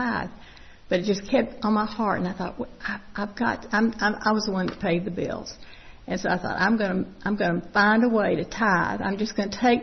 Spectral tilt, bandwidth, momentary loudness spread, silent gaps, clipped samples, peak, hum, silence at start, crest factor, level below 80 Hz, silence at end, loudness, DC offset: -5.5 dB/octave; 6.4 kHz; 11 LU; none; under 0.1%; -8 dBFS; none; 0 s; 16 dB; -50 dBFS; 0 s; -25 LUFS; under 0.1%